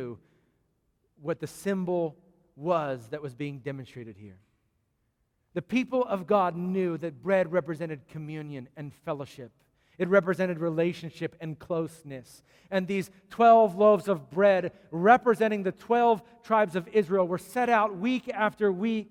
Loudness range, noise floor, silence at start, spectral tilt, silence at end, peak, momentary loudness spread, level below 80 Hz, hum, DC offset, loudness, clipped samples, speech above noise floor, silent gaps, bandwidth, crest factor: 10 LU; -75 dBFS; 0 s; -7 dB/octave; 0.05 s; -6 dBFS; 18 LU; -70 dBFS; none; under 0.1%; -27 LUFS; under 0.1%; 48 dB; none; 16 kHz; 22 dB